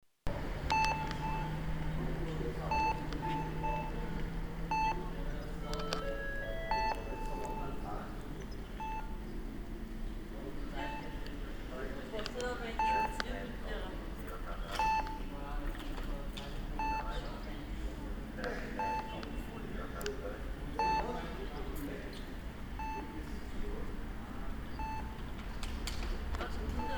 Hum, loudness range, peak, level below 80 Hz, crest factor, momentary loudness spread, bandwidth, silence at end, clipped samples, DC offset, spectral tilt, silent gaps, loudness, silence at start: none; 7 LU; -14 dBFS; -42 dBFS; 24 dB; 11 LU; over 20 kHz; 0 s; under 0.1%; under 0.1%; -5.5 dB/octave; none; -40 LUFS; 0.25 s